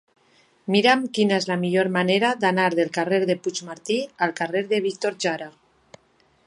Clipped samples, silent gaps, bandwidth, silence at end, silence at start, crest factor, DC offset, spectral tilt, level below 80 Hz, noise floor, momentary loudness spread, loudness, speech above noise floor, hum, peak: under 0.1%; none; 11.5 kHz; 0.95 s; 0.65 s; 18 dB; under 0.1%; -4.5 dB/octave; -70 dBFS; -62 dBFS; 7 LU; -22 LUFS; 40 dB; none; -4 dBFS